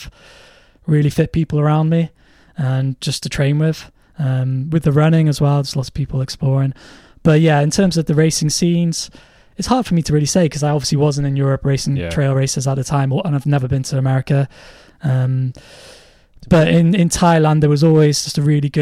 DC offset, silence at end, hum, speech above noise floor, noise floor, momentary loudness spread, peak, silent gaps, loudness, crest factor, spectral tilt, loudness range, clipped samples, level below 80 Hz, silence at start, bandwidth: under 0.1%; 0 s; none; 31 dB; -47 dBFS; 9 LU; -2 dBFS; none; -16 LUFS; 14 dB; -6 dB/octave; 4 LU; under 0.1%; -40 dBFS; 0 s; 14.5 kHz